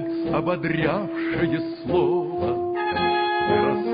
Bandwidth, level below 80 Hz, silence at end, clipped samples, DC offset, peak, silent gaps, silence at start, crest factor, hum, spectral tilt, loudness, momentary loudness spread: 5.2 kHz; -48 dBFS; 0 s; under 0.1%; under 0.1%; -8 dBFS; none; 0 s; 16 dB; none; -11 dB/octave; -23 LUFS; 4 LU